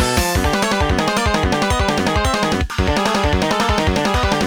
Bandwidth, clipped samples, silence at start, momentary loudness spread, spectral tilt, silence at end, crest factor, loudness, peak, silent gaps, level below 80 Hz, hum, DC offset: over 20 kHz; under 0.1%; 0 s; 1 LU; -4.5 dB/octave; 0 s; 14 dB; -17 LUFS; -2 dBFS; none; -24 dBFS; none; under 0.1%